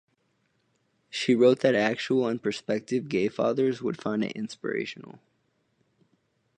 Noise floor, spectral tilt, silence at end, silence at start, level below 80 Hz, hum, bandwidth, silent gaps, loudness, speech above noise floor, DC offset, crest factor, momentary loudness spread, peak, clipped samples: -72 dBFS; -5.5 dB/octave; 1.4 s; 1.15 s; -72 dBFS; none; 9.8 kHz; none; -27 LUFS; 46 dB; under 0.1%; 20 dB; 12 LU; -8 dBFS; under 0.1%